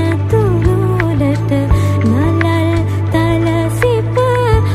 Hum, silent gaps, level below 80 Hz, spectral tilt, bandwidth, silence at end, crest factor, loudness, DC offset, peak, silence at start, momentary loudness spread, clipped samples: none; none; -26 dBFS; -7.5 dB/octave; 13.5 kHz; 0 s; 12 dB; -13 LUFS; under 0.1%; 0 dBFS; 0 s; 2 LU; under 0.1%